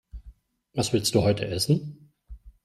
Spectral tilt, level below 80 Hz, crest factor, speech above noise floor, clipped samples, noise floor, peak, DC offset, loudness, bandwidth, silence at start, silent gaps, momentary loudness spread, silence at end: -5 dB/octave; -50 dBFS; 20 dB; 27 dB; under 0.1%; -51 dBFS; -8 dBFS; under 0.1%; -25 LUFS; 15.5 kHz; 0.15 s; none; 10 LU; 0.15 s